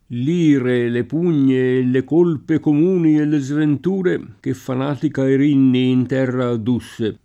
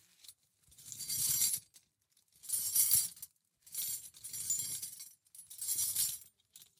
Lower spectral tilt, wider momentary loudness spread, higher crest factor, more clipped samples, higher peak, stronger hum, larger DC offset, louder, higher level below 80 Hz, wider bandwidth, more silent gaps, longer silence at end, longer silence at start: first, -8 dB/octave vs 1.5 dB/octave; second, 7 LU vs 23 LU; second, 12 dB vs 26 dB; neither; first, -4 dBFS vs -12 dBFS; neither; neither; first, -17 LUFS vs -33 LUFS; first, -58 dBFS vs -76 dBFS; second, 10.5 kHz vs 17.5 kHz; neither; about the same, 0.1 s vs 0.15 s; second, 0.1 s vs 0.3 s